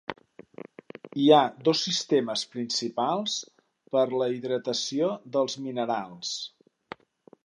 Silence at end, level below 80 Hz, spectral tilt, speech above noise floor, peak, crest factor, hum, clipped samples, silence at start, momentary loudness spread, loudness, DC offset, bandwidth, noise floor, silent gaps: 0.95 s; -78 dBFS; -4 dB/octave; 31 dB; -4 dBFS; 24 dB; none; under 0.1%; 0.1 s; 24 LU; -26 LUFS; under 0.1%; 11 kHz; -58 dBFS; none